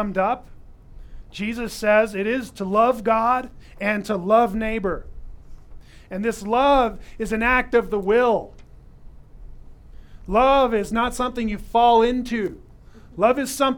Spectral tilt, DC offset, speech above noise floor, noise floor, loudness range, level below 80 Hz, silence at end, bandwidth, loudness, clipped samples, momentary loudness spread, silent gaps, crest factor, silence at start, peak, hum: -5 dB/octave; under 0.1%; 24 dB; -45 dBFS; 3 LU; -40 dBFS; 0 s; 18.5 kHz; -21 LUFS; under 0.1%; 12 LU; none; 18 dB; 0 s; -4 dBFS; none